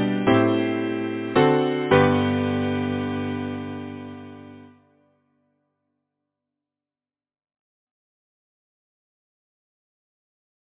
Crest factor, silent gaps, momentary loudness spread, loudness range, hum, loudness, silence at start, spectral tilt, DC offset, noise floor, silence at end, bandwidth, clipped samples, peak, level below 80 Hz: 22 dB; none; 18 LU; 18 LU; none; -22 LUFS; 0 s; -10.5 dB/octave; under 0.1%; under -90 dBFS; 6.1 s; 4 kHz; under 0.1%; -4 dBFS; -52 dBFS